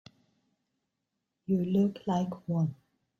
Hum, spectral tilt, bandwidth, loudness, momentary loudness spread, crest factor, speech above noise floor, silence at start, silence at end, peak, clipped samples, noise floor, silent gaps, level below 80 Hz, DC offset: none; -9 dB/octave; 7.4 kHz; -31 LUFS; 6 LU; 16 dB; 55 dB; 1.5 s; 0.45 s; -16 dBFS; under 0.1%; -84 dBFS; none; -70 dBFS; under 0.1%